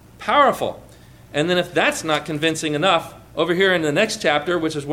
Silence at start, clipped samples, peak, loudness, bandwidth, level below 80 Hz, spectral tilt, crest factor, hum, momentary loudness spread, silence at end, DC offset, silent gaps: 0.2 s; under 0.1%; -4 dBFS; -19 LUFS; 17.5 kHz; -54 dBFS; -4 dB/octave; 16 dB; none; 8 LU; 0 s; under 0.1%; none